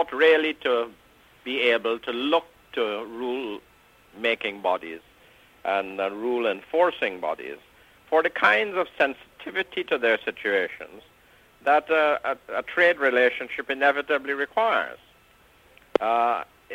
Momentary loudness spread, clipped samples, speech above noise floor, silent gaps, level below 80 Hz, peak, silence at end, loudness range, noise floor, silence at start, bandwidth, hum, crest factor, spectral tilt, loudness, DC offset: 14 LU; under 0.1%; 33 dB; none; -66 dBFS; -4 dBFS; 0 s; 6 LU; -57 dBFS; 0 s; 15.5 kHz; none; 22 dB; -4 dB/octave; -24 LUFS; under 0.1%